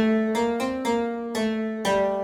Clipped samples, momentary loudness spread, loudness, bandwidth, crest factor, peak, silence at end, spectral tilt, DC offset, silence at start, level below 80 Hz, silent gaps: under 0.1%; 4 LU; -25 LUFS; 16 kHz; 12 dB; -12 dBFS; 0 s; -5 dB/octave; under 0.1%; 0 s; -56 dBFS; none